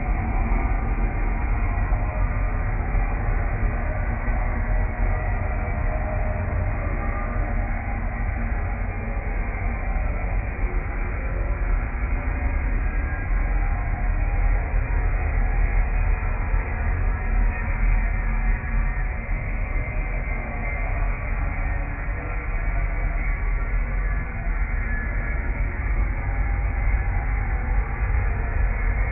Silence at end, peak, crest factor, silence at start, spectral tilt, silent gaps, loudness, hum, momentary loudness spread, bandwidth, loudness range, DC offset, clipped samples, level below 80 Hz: 0 s; -10 dBFS; 12 dB; 0 s; -12.5 dB/octave; none; -27 LUFS; none; 3 LU; 2.8 kHz; 2 LU; under 0.1%; under 0.1%; -24 dBFS